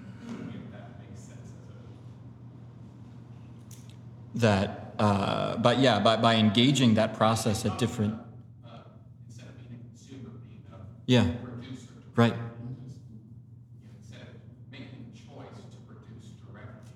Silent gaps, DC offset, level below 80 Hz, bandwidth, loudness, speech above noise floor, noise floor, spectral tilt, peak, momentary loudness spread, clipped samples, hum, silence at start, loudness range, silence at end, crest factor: none; under 0.1%; -62 dBFS; 13.5 kHz; -26 LUFS; 25 dB; -50 dBFS; -5.5 dB/octave; -6 dBFS; 26 LU; under 0.1%; none; 0 s; 23 LU; 0.05 s; 24 dB